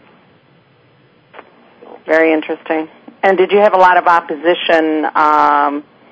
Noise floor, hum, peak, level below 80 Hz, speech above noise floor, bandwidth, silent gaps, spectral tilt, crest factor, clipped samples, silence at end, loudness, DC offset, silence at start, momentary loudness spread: -50 dBFS; none; 0 dBFS; -64 dBFS; 38 dB; 8 kHz; none; -5.5 dB/octave; 14 dB; 0.3%; 0.3 s; -12 LUFS; under 0.1%; 2.05 s; 11 LU